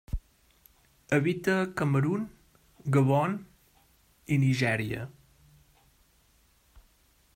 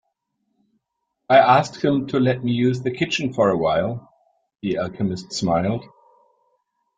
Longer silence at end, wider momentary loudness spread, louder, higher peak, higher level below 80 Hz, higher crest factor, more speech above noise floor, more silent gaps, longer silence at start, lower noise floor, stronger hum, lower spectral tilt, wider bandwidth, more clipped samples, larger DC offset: first, 2.25 s vs 1.15 s; first, 16 LU vs 11 LU; second, -28 LUFS vs -20 LUFS; second, -12 dBFS vs -2 dBFS; first, -50 dBFS vs -56 dBFS; about the same, 18 dB vs 20 dB; second, 38 dB vs 58 dB; neither; second, 0.1 s vs 1.3 s; second, -65 dBFS vs -77 dBFS; neither; about the same, -7 dB/octave vs -6 dB/octave; first, 16 kHz vs 9.4 kHz; neither; neither